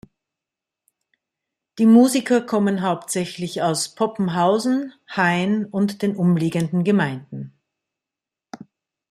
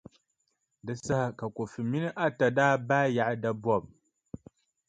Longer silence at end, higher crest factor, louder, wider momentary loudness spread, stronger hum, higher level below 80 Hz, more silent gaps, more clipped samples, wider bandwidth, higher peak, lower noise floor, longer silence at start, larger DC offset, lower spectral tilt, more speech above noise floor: second, 0.55 s vs 1 s; about the same, 18 dB vs 20 dB; first, -20 LUFS vs -29 LUFS; second, 11 LU vs 21 LU; neither; about the same, -64 dBFS vs -64 dBFS; neither; neither; first, 14.5 kHz vs 9.4 kHz; first, -2 dBFS vs -10 dBFS; first, -88 dBFS vs -79 dBFS; first, 1.75 s vs 0.85 s; neither; about the same, -5.5 dB/octave vs -6.5 dB/octave; first, 68 dB vs 50 dB